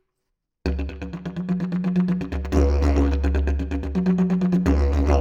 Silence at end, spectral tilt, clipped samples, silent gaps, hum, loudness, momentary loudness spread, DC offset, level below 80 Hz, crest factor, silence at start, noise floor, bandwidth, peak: 0 s; -8.5 dB/octave; under 0.1%; none; none; -23 LUFS; 10 LU; under 0.1%; -24 dBFS; 18 dB; 0.65 s; -78 dBFS; 7.4 kHz; -4 dBFS